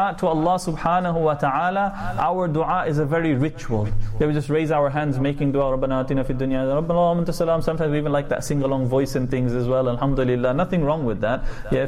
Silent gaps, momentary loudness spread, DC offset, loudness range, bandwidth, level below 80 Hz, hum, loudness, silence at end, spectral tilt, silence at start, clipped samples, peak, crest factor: none; 4 LU; under 0.1%; 1 LU; 14.5 kHz; -34 dBFS; none; -22 LUFS; 0 s; -7.5 dB/octave; 0 s; under 0.1%; -10 dBFS; 12 dB